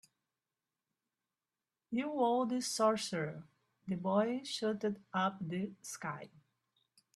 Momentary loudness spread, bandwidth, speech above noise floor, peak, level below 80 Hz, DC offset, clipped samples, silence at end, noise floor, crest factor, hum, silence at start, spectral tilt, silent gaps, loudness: 12 LU; 13.5 kHz; over 54 dB; -18 dBFS; -80 dBFS; under 0.1%; under 0.1%; 0.9 s; under -90 dBFS; 20 dB; none; 1.9 s; -4.5 dB/octave; none; -36 LUFS